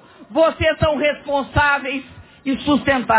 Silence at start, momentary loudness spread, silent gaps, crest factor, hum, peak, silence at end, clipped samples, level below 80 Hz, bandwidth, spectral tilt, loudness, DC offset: 0.2 s; 9 LU; none; 16 dB; none; -4 dBFS; 0 s; under 0.1%; -38 dBFS; 4 kHz; -9.5 dB/octave; -19 LUFS; under 0.1%